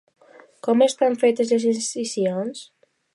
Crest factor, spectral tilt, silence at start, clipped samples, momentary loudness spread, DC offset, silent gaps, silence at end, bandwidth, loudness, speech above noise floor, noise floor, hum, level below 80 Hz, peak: 18 dB; -4.5 dB/octave; 0.65 s; under 0.1%; 12 LU; under 0.1%; none; 0.5 s; 11.5 kHz; -21 LUFS; 25 dB; -45 dBFS; none; -78 dBFS; -6 dBFS